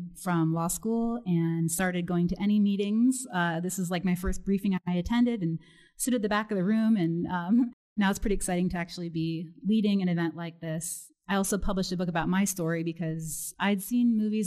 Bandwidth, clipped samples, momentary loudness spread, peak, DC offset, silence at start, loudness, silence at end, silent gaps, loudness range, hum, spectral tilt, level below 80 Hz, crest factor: 13.5 kHz; under 0.1%; 8 LU; -14 dBFS; under 0.1%; 0 s; -28 LUFS; 0 s; 7.73-7.96 s; 3 LU; none; -5.5 dB/octave; -46 dBFS; 14 dB